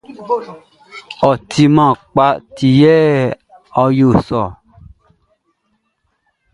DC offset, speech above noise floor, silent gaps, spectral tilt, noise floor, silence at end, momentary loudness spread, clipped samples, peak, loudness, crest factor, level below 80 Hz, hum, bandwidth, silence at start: under 0.1%; 54 dB; none; -7.5 dB/octave; -66 dBFS; 2 s; 11 LU; under 0.1%; 0 dBFS; -13 LUFS; 14 dB; -44 dBFS; none; 11 kHz; 0.1 s